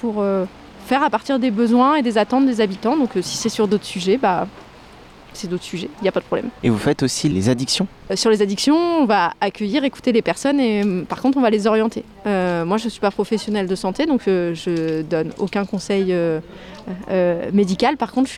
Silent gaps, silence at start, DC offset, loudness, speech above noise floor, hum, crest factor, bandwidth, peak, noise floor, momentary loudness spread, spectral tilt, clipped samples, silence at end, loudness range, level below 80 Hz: none; 0 s; under 0.1%; -19 LUFS; 24 dB; none; 12 dB; 15 kHz; -6 dBFS; -43 dBFS; 7 LU; -5 dB/octave; under 0.1%; 0 s; 4 LU; -50 dBFS